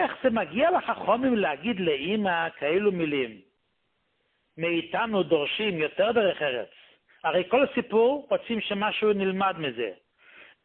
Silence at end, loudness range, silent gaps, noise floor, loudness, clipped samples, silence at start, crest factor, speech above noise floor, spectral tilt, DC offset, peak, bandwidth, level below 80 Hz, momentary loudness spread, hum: 0.2 s; 3 LU; none; -75 dBFS; -26 LUFS; under 0.1%; 0 s; 16 dB; 49 dB; -9.5 dB/octave; under 0.1%; -10 dBFS; 4.3 kHz; -64 dBFS; 7 LU; none